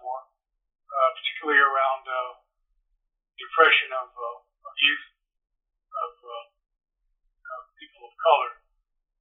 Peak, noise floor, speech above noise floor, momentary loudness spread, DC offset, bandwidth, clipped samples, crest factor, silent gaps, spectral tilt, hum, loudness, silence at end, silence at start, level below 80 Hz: -4 dBFS; -73 dBFS; 51 dB; 22 LU; under 0.1%; 4 kHz; under 0.1%; 24 dB; none; 6 dB/octave; none; -23 LUFS; 0.7 s; 0.05 s; -76 dBFS